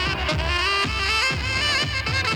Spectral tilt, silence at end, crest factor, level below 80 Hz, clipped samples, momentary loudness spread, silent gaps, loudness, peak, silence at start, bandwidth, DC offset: -3 dB/octave; 0 s; 14 dB; -32 dBFS; under 0.1%; 3 LU; none; -21 LUFS; -10 dBFS; 0 s; over 20 kHz; under 0.1%